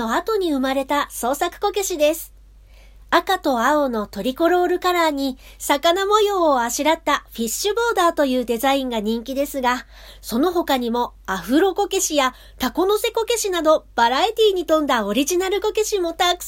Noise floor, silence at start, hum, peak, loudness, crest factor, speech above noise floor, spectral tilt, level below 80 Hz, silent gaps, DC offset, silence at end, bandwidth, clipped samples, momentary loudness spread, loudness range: -46 dBFS; 0 s; none; -2 dBFS; -20 LUFS; 18 dB; 26 dB; -2.5 dB/octave; -46 dBFS; none; under 0.1%; 0 s; 16.5 kHz; under 0.1%; 7 LU; 3 LU